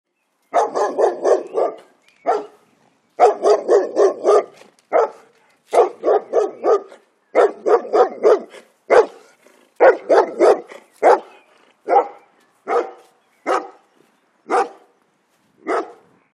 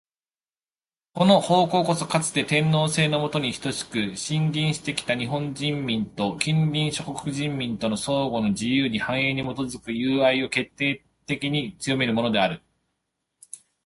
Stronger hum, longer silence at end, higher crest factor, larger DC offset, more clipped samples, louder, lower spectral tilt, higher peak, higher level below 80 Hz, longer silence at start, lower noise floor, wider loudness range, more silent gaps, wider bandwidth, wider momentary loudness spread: neither; first, 0.45 s vs 0.3 s; about the same, 18 dB vs 20 dB; neither; neither; first, -17 LUFS vs -24 LUFS; second, -3.5 dB/octave vs -5 dB/octave; first, 0 dBFS vs -4 dBFS; second, -72 dBFS vs -58 dBFS; second, 0.55 s vs 1.15 s; second, -62 dBFS vs under -90 dBFS; first, 8 LU vs 4 LU; neither; about the same, 11.5 kHz vs 11.5 kHz; about the same, 10 LU vs 9 LU